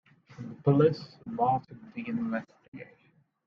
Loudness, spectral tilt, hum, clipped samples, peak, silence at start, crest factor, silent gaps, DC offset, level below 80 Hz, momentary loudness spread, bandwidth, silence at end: -29 LUFS; -9.5 dB/octave; none; under 0.1%; -10 dBFS; 0.4 s; 20 dB; 2.68-2.72 s; under 0.1%; -68 dBFS; 24 LU; 6.4 kHz; 0.65 s